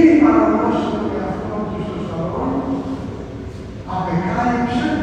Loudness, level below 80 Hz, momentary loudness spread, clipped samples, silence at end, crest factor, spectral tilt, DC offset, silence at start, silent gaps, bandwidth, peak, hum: -19 LUFS; -38 dBFS; 16 LU; under 0.1%; 0 s; 18 dB; -8 dB/octave; under 0.1%; 0 s; none; 8.4 kHz; 0 dBFS; none